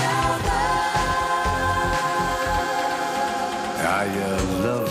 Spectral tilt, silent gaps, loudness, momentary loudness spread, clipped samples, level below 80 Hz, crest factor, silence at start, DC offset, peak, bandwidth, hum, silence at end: -4 dB/octave; none; -23 LUFS; 3 LU; under 0.1%; -36 dBFS; 14 dB; 0 s; under 0.1%; -8 dBFS; 15.5 kHz; none; 0 s